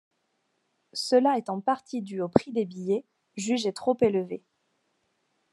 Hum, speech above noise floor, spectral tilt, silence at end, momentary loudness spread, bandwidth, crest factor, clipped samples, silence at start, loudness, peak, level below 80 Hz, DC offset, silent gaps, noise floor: none; 49 dB; -5.5 dB/octave; 1.15 s; 13 LU; 12 kHz; 26 dB; under 0.1%; 0.95 s; -27 LUFS; -2 dBFS; -72 dBFS; under 0.1%; none; -75 dBFS